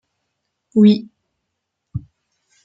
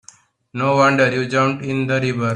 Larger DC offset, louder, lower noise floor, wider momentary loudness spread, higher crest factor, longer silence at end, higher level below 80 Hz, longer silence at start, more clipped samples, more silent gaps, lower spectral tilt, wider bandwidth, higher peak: neither; about the same, -15 LUFS vs -17 LUFS; first, -77 dBFS vs -49 dBFS; first, 20 LU vs 8 LU; about the same, 18 dB vs 16 dB; first, 0.65 s vs 0 s; about the same, -54 dBFS vs -58 dBFS; first, 0.75 s vs 0.55 s; neither; neither; first, -9 dB/octave vs -6 dB/octave; second, 5.6 kHz vs 10 kHz; about the same, -2 dBFS vs -2 dBFS